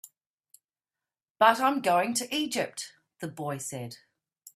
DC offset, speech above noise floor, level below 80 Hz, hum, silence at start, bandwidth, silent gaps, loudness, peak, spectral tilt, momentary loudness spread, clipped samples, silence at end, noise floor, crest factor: under 0.1%; over 62 dB; -76 dBFS; none; 0.05 s; 15.5 kHz; 0.26-0.38 s, 1.30-1.35 s; -27 LUFS; -6 dBFS; -3 dB/octave; 18 LU; under 0.1%; 0.05 s; under -90 dBFS; 24 dB